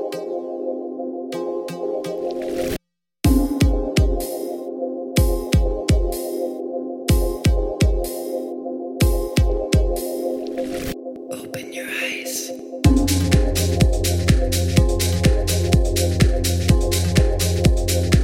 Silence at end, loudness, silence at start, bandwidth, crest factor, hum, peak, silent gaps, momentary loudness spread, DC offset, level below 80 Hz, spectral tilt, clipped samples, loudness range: 0 s; -21 LUFS; 0 s; 17 kHz; 18 dB; none; -2 dBFS; none; 10 LU; under 0.1%; -24 dBFS; -5.5 dB/octave; under 0.1%; 5 LU